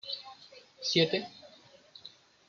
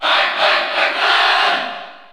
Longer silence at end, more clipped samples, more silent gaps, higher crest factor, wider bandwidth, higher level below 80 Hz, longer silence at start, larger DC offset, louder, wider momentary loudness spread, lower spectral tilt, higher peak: first, 0.4 s vs 0.1 s; neither; neither; first, 24 dB vs 14 dB; second, 7.4 kHz vs over 20 kHz; second, -80 dBFS vs -68 dBFS; about the same, 0.05 s vs 0 s; neither; second, -30 LUFS vs -14 LUFS; first, 25 LU vs 10 LU; first, -4 dB/octave vs -0.5 dB/octave; second, -12 dBFS vs -2 dBFS